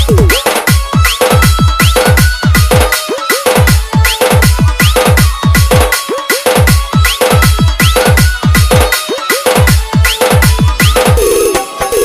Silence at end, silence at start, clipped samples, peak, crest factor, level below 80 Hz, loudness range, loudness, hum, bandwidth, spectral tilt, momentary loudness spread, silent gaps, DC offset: 0 s; 0 s; 0.3%; 0 dBFS; 8 dB; -14 dBFS; 0 LU; -8 LUFS; none; 16.5 kHz; -4.5 dB/octave; 4 LU; none; under 0.1%